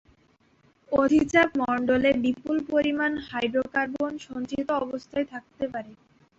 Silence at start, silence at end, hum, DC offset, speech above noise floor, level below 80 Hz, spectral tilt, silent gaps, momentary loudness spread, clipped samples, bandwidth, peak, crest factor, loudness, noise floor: 0.9 s; 0.45 s; none; under 0.1%; 38 dB; -56 dBFS; -5.5 dB/octave; none; 11 LU; under 0.1%; 8 kHz; -8 dBFS; 18 dB; -26 LUFS; -63 dBFS